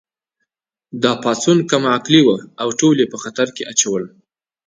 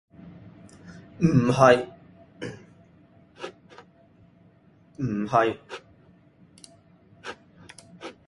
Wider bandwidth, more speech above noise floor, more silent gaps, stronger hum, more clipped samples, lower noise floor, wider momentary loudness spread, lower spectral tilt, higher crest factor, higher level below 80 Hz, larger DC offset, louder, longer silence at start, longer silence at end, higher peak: second, 9.8 kHz vs 11.5 kHz; first, 60 dB vs 36 dB; neither; neither; neither; first, -76 dBFS vs -57 dBFS; second, 9 LU vs 29 LU; second, -4 dB/octave vs -6.5 dB/octave; second, 18 dB vs 26 dB; about the same, -62 dBFS vs -58 dBFS; neither; first, -16 LUFS vs -22 LUFS; first, 0.95 s vs 0.25 s; first, 0.6 s vs 0.15 s; about the same, 0 dBFS vs -2 dBFS